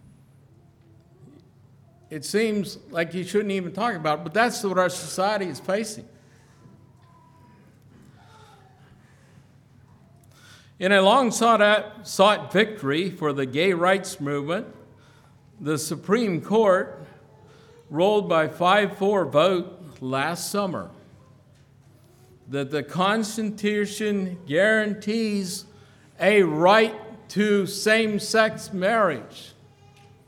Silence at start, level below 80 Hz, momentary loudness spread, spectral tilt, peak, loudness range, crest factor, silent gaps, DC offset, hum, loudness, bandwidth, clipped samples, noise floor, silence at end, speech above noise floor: 2.1 s; -68 dBFS; 13 LU; -4.5 dB/octave; -2 dBFS; 8 LU; 22 dB; none; under 0.1%; none; -23 LUFS; 17.5 kHz; under 0.1%; -54 dBFS; 0.8 s; 32 dB